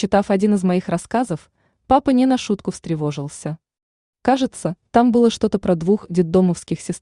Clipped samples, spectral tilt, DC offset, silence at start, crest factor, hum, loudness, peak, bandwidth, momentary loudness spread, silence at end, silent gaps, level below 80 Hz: under 0.1%; -6.5 dB/octave; under 0.1%; 0 s; 16 dB; none; -19 LUFS; -4 dBFS; 11 kHz; 12 LU; 0.05 s; 3.83-4.13 s; -48 dBFS